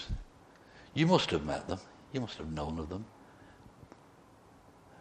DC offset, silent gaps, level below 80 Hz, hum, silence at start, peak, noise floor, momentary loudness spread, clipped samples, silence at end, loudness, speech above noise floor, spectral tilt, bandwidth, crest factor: under 0.1%; none; -50 dBFS; none; 0 s; -10 dBFS; -59 dBFS; 29 LU; under 0.1%; 1.3 s; -34 LUFS; 26 dB; -6 dB/octave; 9.8 kHz; 26 dB